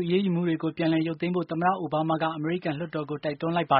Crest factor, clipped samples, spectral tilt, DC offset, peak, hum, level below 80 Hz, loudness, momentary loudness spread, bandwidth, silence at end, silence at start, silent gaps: 18 dB; under 0.1%; -5.5 dB/octave; under 0.1%; -8 dBFS; none; -66 dBFS; -27 LUFS; 6 LU; 5.2 kHz; 0 s; 0 s; none